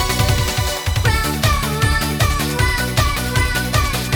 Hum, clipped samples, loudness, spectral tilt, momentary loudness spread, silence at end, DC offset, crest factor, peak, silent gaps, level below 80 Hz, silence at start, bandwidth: none; under 0.1%; -17 LUFS; -4 dB/octave; 1 LU; 0 s; under 0.1%; 16 dB; -2 dBFS; none; -24 dBFS; 0 s; over 20 kHz